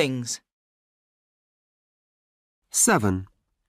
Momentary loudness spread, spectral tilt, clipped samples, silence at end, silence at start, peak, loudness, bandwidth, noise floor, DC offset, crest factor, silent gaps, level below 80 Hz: 13 LU; -3.5 dB/octave; under 0.1%; 0.45 s; 0 s; -8 dBFS; -23 LUFS; 15.5 kHz; under -90 dBFS; under 0.1%; 22 dB; 0.52-2.62 s; -62 dBFS